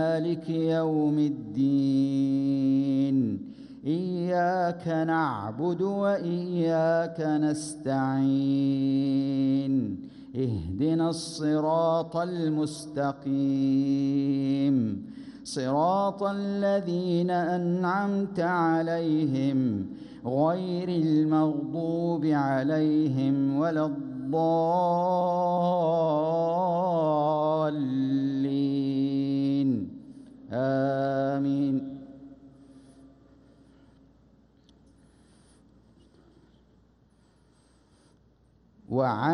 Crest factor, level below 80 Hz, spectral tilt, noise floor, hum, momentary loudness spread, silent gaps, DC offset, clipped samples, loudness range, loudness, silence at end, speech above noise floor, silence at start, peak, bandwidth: 14 dB; -64 dBFS; -7.5 dB/octave; -62 dBFS; none; 6 LU; none; under 0.1%; under 0.1%; 3 LU; -27 LUFS; 0 s; 36 dB; 0 s; -14 dBFS; 11 kHz